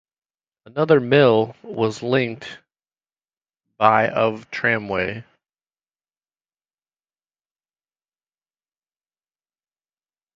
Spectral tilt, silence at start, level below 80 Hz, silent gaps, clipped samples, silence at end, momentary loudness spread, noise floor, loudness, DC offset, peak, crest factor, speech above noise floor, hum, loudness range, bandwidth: -6.5 dB/octave; 0.75 s; -60 dBFS; none; under 0.1%; 5.15 s; 14 LU; under -90 dBFS; -19 LUFS; under 0.1%; 0 dBFS; 24 dB; over 71 dB; none; 7 LU; 7.6 kHz